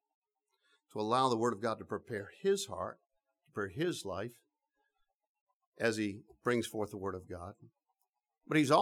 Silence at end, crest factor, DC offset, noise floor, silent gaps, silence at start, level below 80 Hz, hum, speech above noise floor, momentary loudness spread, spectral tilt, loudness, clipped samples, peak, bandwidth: 0 s; 24 dB; under 0.1%; -86 dBFS; 5.15-5.19 s, 5.29-5.35 s, 5.41-5.47 s, 5.56-5.60 s, 5.67-5.72 s; 0.95 s; -74 dBFS; none; 51 dB; 14 LU; -5 dB/octave; -36 LUFS; under 0.1%; -14 dBFS; 16 kHz